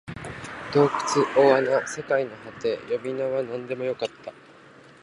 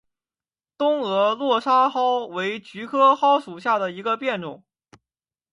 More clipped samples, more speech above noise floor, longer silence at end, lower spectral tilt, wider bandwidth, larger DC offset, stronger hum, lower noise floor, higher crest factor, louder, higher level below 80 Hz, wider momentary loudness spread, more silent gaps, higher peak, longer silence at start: neither; second, 26 dB vs over 69 dB; second, 0.7 s vs 0.95 s; about the same, -5 dB/octave vs -5 dB/octave; about the same, 11.5 kHz vs 11 kHz; neither; neither; second, -50 dBFS vs under -90 dBFS; about the same, 20 dB vs 18 dB; second, -24 LUFS vs -21 LUFS; first, -60 dBFS vs -74 dBFS; first, 17 LU vs 10 LU; neither; about the same, -4 dBFS vs -6 dBFS; second, 0.05 s vs 0.8 s